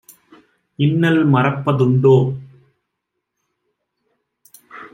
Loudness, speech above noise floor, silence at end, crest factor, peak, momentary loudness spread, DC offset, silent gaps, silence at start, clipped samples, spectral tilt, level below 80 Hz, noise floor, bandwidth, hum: -15 LUFS; 63 dB; 0.05 s; 16 dB; -2 dBFS; 11 LU; under 0.1%; none; 0.8 s; under 0.1%; -8.5 dB/octave; -60 dBFS; -77 dBFS; 15 kHz; none